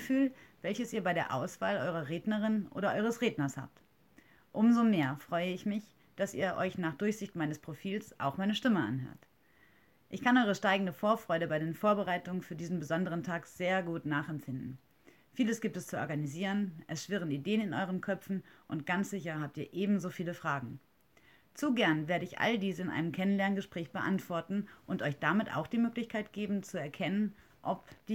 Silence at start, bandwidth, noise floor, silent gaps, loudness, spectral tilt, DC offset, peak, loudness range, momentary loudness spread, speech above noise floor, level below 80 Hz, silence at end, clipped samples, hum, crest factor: 0 s; 17 kHz; -67 dBFS; none; -34 LUFS; -6 dB/octave; under 0.1%; -14 dBFS; 4 LU; 10 LU; 33 dB; -74 dBFS; 0 s; under 0.1%; none; 20 dB